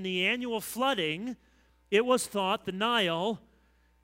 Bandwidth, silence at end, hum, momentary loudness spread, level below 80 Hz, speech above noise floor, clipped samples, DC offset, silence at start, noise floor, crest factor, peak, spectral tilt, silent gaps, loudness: 16 kHz; 0.65 s; none; 10 LU; -66 dBFS; 36 dB; under 0.1%; under 0.1%; 0 s; -65 dBFS; 20 dB; -10 dBFS; -3.5 dB/octave; none; -29 LUFS